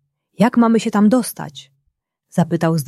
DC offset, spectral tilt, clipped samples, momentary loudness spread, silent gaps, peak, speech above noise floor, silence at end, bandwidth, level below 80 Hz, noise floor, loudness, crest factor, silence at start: under 0.1%; -6.5 dB/octave; under 0.1%; 13 LU; none; -2 dBFS; 54 dB; 0 s; 14 kHz; -62 dBFS; -70 dBFS; -16 LUFS; 16 dB; 0.4 s